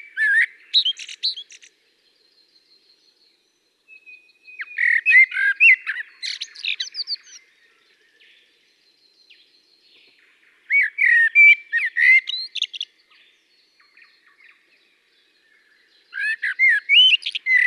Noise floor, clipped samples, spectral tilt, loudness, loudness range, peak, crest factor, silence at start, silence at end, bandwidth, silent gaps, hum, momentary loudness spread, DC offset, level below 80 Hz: -66 dBFS; under 0.1%; 6.5 dB/octave; -16 LUFS; 17 LU; -4 dBFS; 18 dB; 0.15 s; 0 s; 11.5 kHz; none; none; 17 LU; under 0.1%; under -90 dBFS